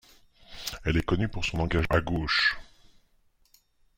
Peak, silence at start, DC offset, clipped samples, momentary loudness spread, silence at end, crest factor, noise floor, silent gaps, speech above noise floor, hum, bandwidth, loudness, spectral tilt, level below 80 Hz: -10 dBFS; 0.5 s; under 0.1%; under 0.1%; 14 LU; 1.35 s; 20 dB; -65 dBFS; none; 39 dB; none; 16.5 kHz; -27 LUFS; -5 dB/octave; -42 dBFS